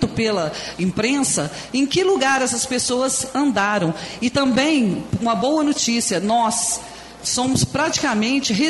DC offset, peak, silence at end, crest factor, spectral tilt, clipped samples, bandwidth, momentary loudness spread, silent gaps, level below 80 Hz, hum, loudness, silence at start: under 0.1%; -6 dBFS; 0 s; 14 dB; -3.5 dB/octave; under 0.1%; 12 kHz; 6 LU; none; -48 dBFS; none; -19 LUFS; 0 s